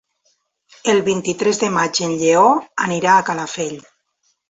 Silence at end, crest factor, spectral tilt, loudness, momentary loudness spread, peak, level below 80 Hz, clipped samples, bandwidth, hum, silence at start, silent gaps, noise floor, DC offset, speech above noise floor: 0.7 s; 16 dB; -3.5 dB/octave; -17 LUFS; 11 LU; -2 dBFS; -62 dBFS; under 0.1%; 8.2 kHz; none; 0.85 s; none; -67 dBFS; under 0.1%; 50 dB